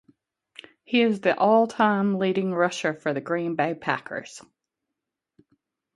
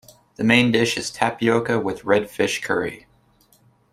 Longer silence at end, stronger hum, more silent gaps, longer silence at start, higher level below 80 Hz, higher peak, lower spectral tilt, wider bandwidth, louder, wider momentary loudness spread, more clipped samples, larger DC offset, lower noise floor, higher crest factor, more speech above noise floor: first, 1.55 s vs 0.95 s; neither; neither; first, 0.9 s vs 0.4 s; second, -72 dBFS vs -56 dBFS; second, -6 dBFS vs -2 dBFS; about the same, -5.5 dB/octave vs -4.5 dB/octave; second, 11.5 kHz vs 15 kHz; second, -24 LUFS vs -20 LUFS; about the same, 10 LU vs 8 LU; neither; neither; first, -85 dBFS vs -58 dBFS; about the same, 20 dB vs 20 dB; first, 61 dB vs 38 dB